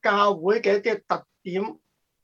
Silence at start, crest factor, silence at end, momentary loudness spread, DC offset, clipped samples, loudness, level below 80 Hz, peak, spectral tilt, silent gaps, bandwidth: 0.05 s; 18 dB; 0.5 s; 10 LU; under 0.1%; under 0.1%; -24 LUFS; -76 dBFS; -6 dBFS; -5.5 dB/octave; none; 7.2 kHz